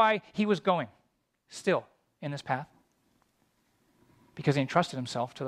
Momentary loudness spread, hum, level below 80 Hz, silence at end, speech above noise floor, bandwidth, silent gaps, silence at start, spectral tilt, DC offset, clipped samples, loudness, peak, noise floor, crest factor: 16 LU; none; -72 dBFS; 0 s; 45 dB; 13 kHz; none; 0 s; -6 dB/octave; under 0.1%; under 0.1%; -30 LUFS; -8 dBFS; -74 dBFS; 24 dB